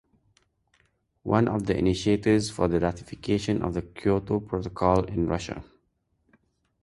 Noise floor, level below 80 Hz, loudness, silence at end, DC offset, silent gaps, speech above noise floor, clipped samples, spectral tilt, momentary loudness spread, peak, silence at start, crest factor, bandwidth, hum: -72 dBFS; -46 dBFS; -26 LUFS; 1.2 s; under 0.1%; none; 47 dB; under 0.1%; -6.5 dB/octave; 8 LU; -6 dBFS; 1.25 s; 22 dB; 11.5 kHz; none